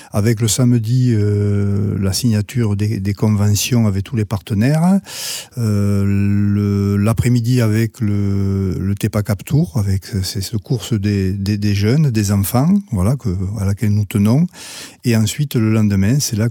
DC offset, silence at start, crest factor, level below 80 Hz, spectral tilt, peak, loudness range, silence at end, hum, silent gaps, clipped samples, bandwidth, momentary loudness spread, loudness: under 0.1%; 0 s; 14 dB; -44 dBFS; -6 dB/octave; -2 dBFS; 2 LU; 0 s; none; none; under 0.1%; 18 kHz; 6 LU; -17 LUFS